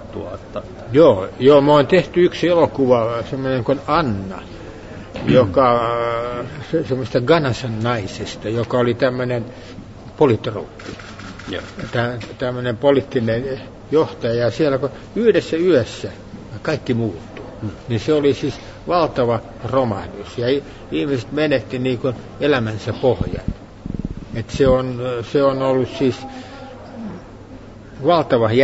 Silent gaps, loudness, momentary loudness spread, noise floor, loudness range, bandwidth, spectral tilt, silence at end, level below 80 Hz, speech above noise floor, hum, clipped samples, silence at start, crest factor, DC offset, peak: none; -18 LUFS; 18 LU; -37 dBFS; 6 LU; 8 kHz; -7 dB/octave; 0 s; -42 dBFS; 20 dB; none; under 0.1%; 0 s; 18 dB; under 0.1%; -2 dBFS